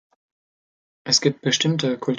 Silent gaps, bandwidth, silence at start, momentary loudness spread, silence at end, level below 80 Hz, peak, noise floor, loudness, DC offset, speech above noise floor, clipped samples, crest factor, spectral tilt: none; 10 kHz; 1.05 s; 5 LU; 0 s; -68 dBFS; -4 dBFS; under -90 dBFS; -20 LUFS; under 0.1%; over 69 dB; under 0.1%; 20 dB; -3.5 dB/octave